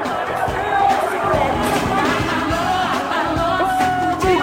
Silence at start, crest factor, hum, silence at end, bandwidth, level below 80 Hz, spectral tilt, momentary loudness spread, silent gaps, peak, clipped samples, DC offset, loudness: 0 s; 12 dB; none; 0 s; 16.5 kHz; -38 dBFS; -5 dB/octave; 3 LU; none; -6 dBFS; under 0.1%; under 0.1%; -18 LUFS